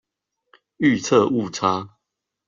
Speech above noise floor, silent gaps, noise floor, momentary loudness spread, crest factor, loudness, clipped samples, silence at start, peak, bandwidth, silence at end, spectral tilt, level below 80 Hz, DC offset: 62 dB; none; -81 dBFS; 9 LU; 20 dB; -20 LUFS; under 0.1%; 0.8 s; -4 dBFS; 7.6 kHz; 0.6 s; -5 dB/octave; -62 dBFS; under 0.1%